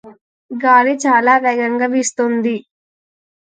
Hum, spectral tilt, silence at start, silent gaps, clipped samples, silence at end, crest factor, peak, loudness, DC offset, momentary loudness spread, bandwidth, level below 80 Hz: none; -3.5 dB/octave; 0.05 s; 0.21-0.49 s; under 0.1%; 0.85 s; 16 dB; 0 dBFS; -14 LUFS; under 0.1%; 9 LU; 9.6 kHz; -72 dBFS